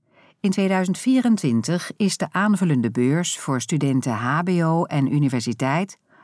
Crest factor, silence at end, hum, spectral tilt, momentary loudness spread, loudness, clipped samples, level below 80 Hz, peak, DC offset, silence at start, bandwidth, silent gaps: 14 dB; 0.3 s; none; -5.5 dB/octave; 4 LU; -21 LUFS; under 0.1%; -72 dBFS; -8 dBFS; under 0.1%; 0.45 s; 11 kHz; none